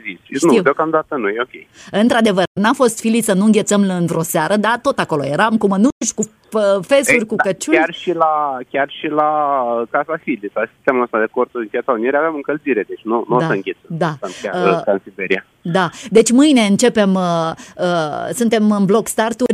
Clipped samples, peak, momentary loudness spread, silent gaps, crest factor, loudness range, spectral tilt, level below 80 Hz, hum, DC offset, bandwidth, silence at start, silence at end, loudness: under 0.1%; 0 dBFS; 8 LU; 2.47-2.55 s, 5.92-6.01 s; 16 dB; 4 LU; -5 dB/octave; -58 dBFS; none; under 0.1%; 15.5 kHz; 0.05 s; 0 s; -16 LUFS